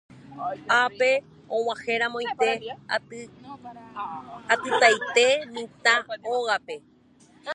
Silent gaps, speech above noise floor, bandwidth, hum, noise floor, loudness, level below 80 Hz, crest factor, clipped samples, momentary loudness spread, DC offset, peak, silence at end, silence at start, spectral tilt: none; 31 dB; 11 kHz; none; -56 dBFS; -24 LUFS; -70 dBFS; 22 dB; under 0.1%; 21 LU; under 0.1%; -4 dBFS; 0 s; 0.15 s; -1.5 dB/octave